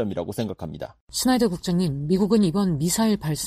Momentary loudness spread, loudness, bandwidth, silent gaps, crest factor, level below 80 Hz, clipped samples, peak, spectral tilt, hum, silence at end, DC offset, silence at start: 11 LU; -23 LUFS; 15.5 kHz; 1.01-1.07 s; 14 dB; -48 dBFS; under 0.1%; -8 dBFS; -5.5 dB/octave; none; 0 s; under 0.1%; 0 s